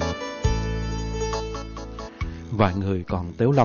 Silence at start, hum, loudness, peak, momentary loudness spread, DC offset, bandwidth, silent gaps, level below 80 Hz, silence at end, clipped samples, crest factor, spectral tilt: 0 s; none; -27 LUFS; -6 dBFS; 12 LU; under 0.1%; 7 kHz; none; -32 dBFS; 0 s; under 0.1%; 18 dB; -6.5 dB/octave